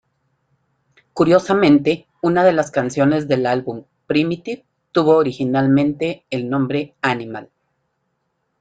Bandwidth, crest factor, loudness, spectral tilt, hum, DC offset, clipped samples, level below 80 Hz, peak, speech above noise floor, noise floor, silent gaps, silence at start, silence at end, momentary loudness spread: 9 kHz; 16 dB; -18 LUFS; -7 dB/octave; none; under 0.1%; under 0.1%; -58 dBFS; -2 dBFS; 54 dB; -71 dBFS; none; 1.15 s; 1.15 s; 15 LU